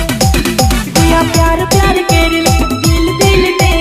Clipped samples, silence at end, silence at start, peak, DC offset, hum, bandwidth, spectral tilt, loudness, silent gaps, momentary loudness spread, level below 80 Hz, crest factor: under 0.1%; 0 s; 0 s; 0 dBFS; under 0.1%; none; 16 kHz; -4.5 dB/octave; -10 LUFS; none; 2 LU; -16 dBFS; 10 dB